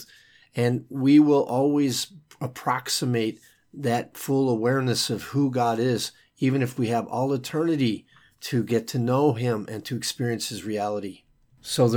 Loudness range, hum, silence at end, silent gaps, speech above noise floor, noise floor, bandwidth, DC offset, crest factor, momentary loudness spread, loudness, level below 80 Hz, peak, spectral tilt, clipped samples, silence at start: 3 LU; none; 0 s; none; 31 dB; -55 dBFS; 20 kHz; under 0.1%; 16 dB; 10 LU; -25 LUFS; -68 dBFS; -8 dBFS; -5.5 dB/octave; under 0.1%; 0 s